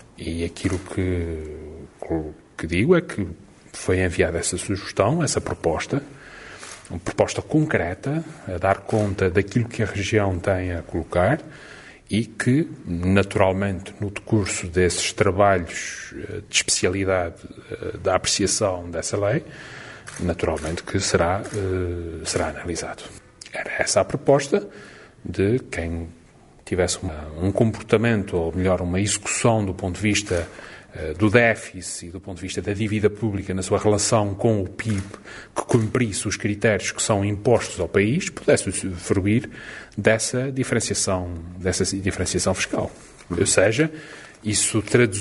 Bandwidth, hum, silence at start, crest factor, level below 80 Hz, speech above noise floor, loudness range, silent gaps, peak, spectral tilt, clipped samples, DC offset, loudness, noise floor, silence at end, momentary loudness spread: 11.5 kHz; none; 0.2 s; 22 dB; -44 dBFS; 25 dB; 3 LU; none; 0 dBFS; -4.5 dB/octave; under 0.1%; under 0.1%; -23 LUFS; -47 dBFS; 0 s; 15 LU